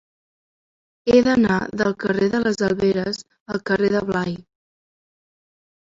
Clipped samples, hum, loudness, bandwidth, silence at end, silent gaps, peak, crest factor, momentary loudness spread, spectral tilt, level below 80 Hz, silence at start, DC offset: under 0.1%; none; -20 LUFS; 7.8 kHz; 1.5 s; 3.40-3.46 s; -4 dBFS; 18 dB; 12 LU; -6 dB/octave; -52 dBFS; 1.05 s; under 0.1%